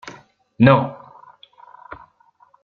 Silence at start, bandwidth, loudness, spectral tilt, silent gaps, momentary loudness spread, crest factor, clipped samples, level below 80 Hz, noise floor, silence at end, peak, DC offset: 0.05 s; 7 kHz; -16 LUFS; -8.5 dB/octave; none; 27 LU; 20 dB; under 0.1%; -54 dBFS; -56 dBFS; 1.7 s; -2 dBFS; under 0.1%